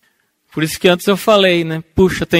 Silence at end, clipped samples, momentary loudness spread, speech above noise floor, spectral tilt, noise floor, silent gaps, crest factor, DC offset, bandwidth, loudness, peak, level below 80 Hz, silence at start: 0 s; under 0.1%; 9 LU; 48 dB; -5 dB/octave; -61 dBFS; none; 14 dB; under 0.1%; 16.5 kHz; -14 LUFS; 0 dBFS; -38 dBFS; 0.55 s